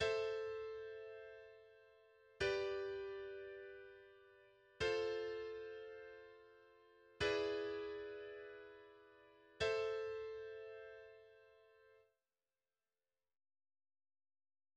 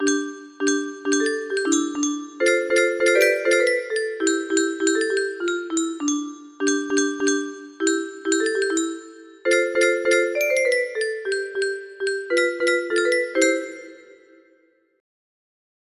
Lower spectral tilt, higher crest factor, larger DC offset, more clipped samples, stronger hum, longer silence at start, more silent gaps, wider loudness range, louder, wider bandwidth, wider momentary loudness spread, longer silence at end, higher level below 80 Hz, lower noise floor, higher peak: first, -4 dB/octave vs -0.5 dB/octave; about the same, 20 dB vs 18 dB; neither; neither; neither; about the same, 0 s vs 0 s; neither; about the same, 5 LU vs 3 LU; second, -45 LUFS vs -22 LUFS; second, 9.4 kHz vs 13 kHz; first, 24 LU vs 8 LU; first, 2.75 s vs 2 s; about the same, -72 dBFS vs -70 dBFS; first, under -90 dBFS vs -61 dBFS; second, -28 dBFS vs -4 dBFS